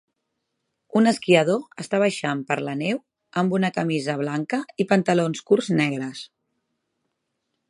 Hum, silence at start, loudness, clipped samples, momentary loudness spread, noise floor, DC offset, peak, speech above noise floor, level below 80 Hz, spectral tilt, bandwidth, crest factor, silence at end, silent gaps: none; 0.95 s; -23 LUFS; under 0.1%; 10 LU; -78 dBFS; under 0.1%; -2 dBFS; 56 dB; -72 dBFS; -6 dB/octave; 11.5 kHz; 22 dB; 1.45 s; none